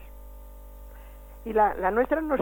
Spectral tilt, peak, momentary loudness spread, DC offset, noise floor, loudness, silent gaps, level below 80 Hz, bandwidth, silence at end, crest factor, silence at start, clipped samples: -7.5 dB/octave; -10 dBFS; 24 LU; under 0.1%; -44 dBFS; -25 LUFS; none; -44 dBFS; 17.5 kHz; 0 s; 18 dB; 0 s; under 0.1%